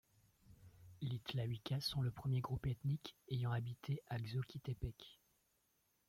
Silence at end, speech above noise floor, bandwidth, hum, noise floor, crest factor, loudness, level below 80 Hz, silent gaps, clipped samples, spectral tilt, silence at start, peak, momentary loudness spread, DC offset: 0.95 s; 38 dB; 15.5 kHz; none; -81 dBFS; 16 dB; -44 LUFS; -64 dBFS; none; under 0.1%; -6.5 dB/octave; 0.5 s; -28 dBFS; 9 LU; under 0.1%